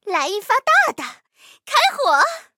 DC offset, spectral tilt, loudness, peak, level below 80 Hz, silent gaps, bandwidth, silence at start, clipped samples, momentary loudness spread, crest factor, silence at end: under 0.1%; 0.5 dB/octave; -17 LUFS; -2 dBFS; -82 dBFS; none; 16.5 kHz; 0.05 s; under 0.1%; 8 LU; 18 dB; 0.15 s